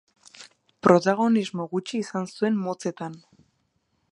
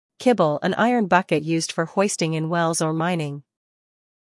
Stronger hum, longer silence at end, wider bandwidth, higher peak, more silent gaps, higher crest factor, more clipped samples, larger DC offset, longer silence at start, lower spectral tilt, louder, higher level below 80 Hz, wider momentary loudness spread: neither; about the same, 0.95 s vs 0.9 s; about the same, 11 kHz vs 12 kHz; about the same, -2 dBFS vs -4 dBFS; neither; first, 24 dB vs 18 dB; neither; neither; first, 0.4 s vs 0.2 s; about the same, -6 dB/octave vs -5 dB/octave; second, -24 LUFS vs -21 LUFS; about the same, -68 dBFS vs -70 dBFS; first, 12 LU vs 5 LU